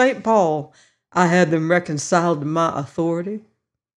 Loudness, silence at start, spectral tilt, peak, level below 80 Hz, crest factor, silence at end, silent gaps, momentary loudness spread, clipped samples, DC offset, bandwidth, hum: -19 LUFS; 0 s; -5.5 dB/octave; -4 dBFS; -64 dBFS; 16 dB; 0.55 s; none; 10 LU; under 0.1%; under 0.1%; 11 kHz; none